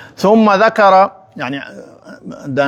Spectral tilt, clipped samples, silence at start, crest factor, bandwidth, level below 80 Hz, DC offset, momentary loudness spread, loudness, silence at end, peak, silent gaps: -6 dB/octave; under 0.1%; 0 s; 14 dB; 14 kHz; -60 dBFS; under 0.1%; 21 LU; -12 LUFS; 0 s; 0 dBFS; none